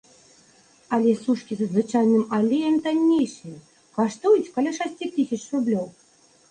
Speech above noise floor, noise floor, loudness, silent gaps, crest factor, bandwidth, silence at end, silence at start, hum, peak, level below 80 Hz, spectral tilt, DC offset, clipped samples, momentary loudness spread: 34 dB; -56 dBFS; -23 LUFS; none; 14 dB; 9.6 kHz; 0.6 s; 0.9 s; none; -8 dBFS; -68 dBFS; -6 dB/octave; under 0.1%; under 0.1%; 9 LU